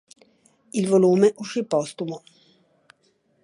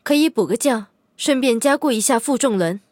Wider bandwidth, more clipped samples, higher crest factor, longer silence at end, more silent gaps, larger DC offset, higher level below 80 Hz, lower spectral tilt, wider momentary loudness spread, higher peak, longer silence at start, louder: second, 11.5 kHz vs 17 kHz; neither; about the same, 18 dB vs 14 dB; first, 1.25 s vs 0.15 s; neither; neither; second, -76 dBFS vs -70 dBFS; first, -6.5 dB/octave vs -3.5 dB/octave; first, 15 LU vs 5 LU; about the same, -6 dBFS vs -4 dBFS; first, 0.75 s vs 0.05 s; second, -22 LUFS vs -18 LUFS